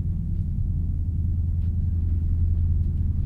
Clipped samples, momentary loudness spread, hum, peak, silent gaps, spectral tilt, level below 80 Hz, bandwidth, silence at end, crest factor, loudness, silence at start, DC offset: under 0.1%; 4 LU; none; -12 dBFS; none; -11.5 dB/octave; -26 dBFS; 0.9 kHz; 0 s; 10 dB; -26 LUFS; 0 s; under 0.1%